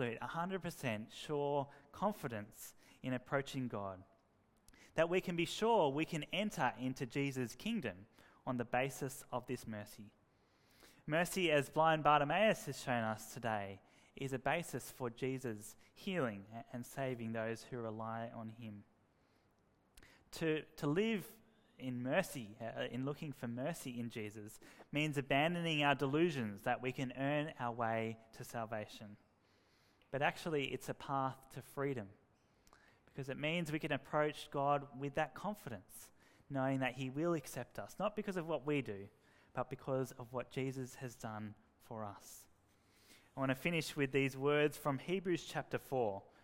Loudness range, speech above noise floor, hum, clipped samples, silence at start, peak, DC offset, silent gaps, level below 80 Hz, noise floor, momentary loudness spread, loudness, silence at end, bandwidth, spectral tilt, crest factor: 8 LU; 35 dB; none; under 0.1%; 0 s; -16 dBFS; under 0.1%; none; -70 dBFS; -75 dBFS; 16 LU; -40 LUFS; 0.2 s; 16 kHz; -5.5 dB/octave; 24 dB